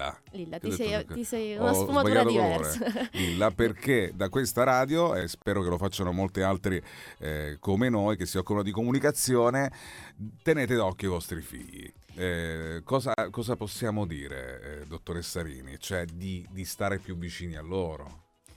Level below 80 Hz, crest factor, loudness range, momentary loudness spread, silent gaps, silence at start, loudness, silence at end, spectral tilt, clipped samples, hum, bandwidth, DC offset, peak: -50 dBFS; 20 dB; 9 LU; 16 LU; none; 0 s; -29 LUFS; 0.05 s; -5 dB/octave; under 0.1%; none; 17.5 kHz; under 0.1%; -8 dBFS